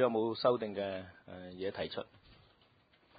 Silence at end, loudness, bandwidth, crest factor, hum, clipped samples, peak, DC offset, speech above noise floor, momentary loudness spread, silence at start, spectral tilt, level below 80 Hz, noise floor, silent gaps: 0.85 s; -36 LUFS; 4.9 kHz; 22 dB; none; under 0.1%; -16 dBFS; under 0.1%; 33 dB; 19 LU; 0 s; -4 dB/octave; -68 dBFS; -68 dBFS; none